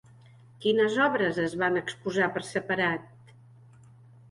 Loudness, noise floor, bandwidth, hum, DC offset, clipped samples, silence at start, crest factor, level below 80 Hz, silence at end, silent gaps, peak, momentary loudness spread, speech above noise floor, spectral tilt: -27 LUFS; -54 dBFS; 11.5 kHz; none; under 0.1%; under 0.1%; 0.6 s; 18 dB; -66 dBFS; 1.25 s; none; -12 dBFS; 7 LU; 27 dB; -5 dB/octave